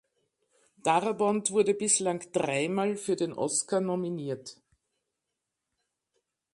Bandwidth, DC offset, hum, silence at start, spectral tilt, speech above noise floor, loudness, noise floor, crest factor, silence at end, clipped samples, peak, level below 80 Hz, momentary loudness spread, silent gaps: 11.5 kHz; under 0.1%; none; 0.85 s; -4 dB/octave; 57 dB; -28 LUFS; -85 dBFS; 20 dB; 2 s; under 0.1%; -12 dBFS; -76 dBFS; 9 LU; none